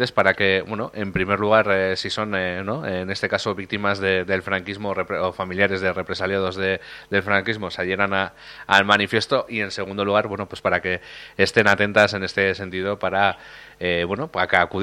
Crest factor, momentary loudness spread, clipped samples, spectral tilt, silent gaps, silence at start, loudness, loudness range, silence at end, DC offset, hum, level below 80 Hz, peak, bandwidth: 22 dB; 9 LU; under 0.1%; -5 dB/octave; none; 0 s; -21 LUFS; 3 LU; 0 s; under 0.1%; none; -54 dBFS; 0 dBFS; 13.5 kHz